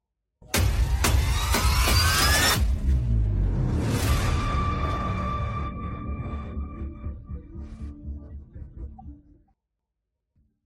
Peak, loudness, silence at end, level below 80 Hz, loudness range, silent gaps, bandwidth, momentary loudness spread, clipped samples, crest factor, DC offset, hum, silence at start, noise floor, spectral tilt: -8 dBFS; -25 LUFS; 1.5 s; -28 dBFS; 18 LU; none; 16.5 kHz; 21 LU; under 0.1%; 16 dB; under 0.1%; none; 0.4 s; -82 dBFS; -4 dB/octave